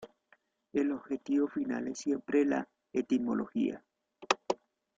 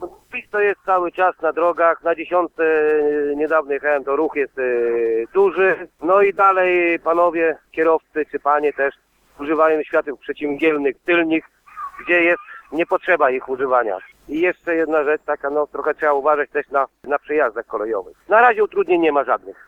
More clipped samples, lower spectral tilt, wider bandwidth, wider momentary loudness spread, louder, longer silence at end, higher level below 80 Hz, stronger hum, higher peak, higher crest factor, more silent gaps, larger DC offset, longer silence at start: neither; second, -4.5 dB/octave vs -6.5 dB/octave; first, 7.8 kHz vs 4.9 kHz; about the same, 8 LU vs 9 LU; second, -33 LUFS vs -18 LUFS; first, 0.45 s vs 0.15 s; second, -74 dBFS vs -58 dBFS; neither; second, -10 dBFS vs -2 dBFS; first, 24 dB vs 18 dB; neither; neither; about the same, 0 s vs 0 s